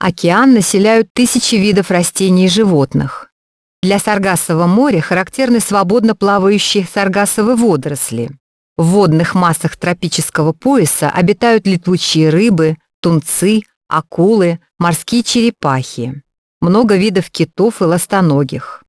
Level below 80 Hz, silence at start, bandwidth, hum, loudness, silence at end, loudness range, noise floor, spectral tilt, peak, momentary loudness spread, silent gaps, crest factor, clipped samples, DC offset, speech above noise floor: -48 dBFS; 0 s; 11 kHz; none; -12 LUFS; 0.1 s; 2 LU; under -90 dBFS; -5 dB/octave; 0 dBFS; 8 LU; 1.10-1.15 s, 3.32-3.82 s, 8.40-8.76 s, 12.94-13.03 s, 13.76-13.81 s, 16.38-16.61 s; 12 dB; under 0.1%; under 0.1%; over 78 dB